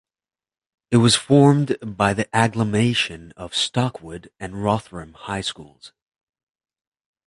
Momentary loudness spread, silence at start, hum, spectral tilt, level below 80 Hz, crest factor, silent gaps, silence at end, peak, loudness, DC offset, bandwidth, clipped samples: 21 LU; 0.9 s; none; -5 dB/octave; -52 dBFS; 20 dB; none; 1.4 s; -2 dBFS; -20 LUFS; under 0.1%; 11.5 kHz; under 0.1%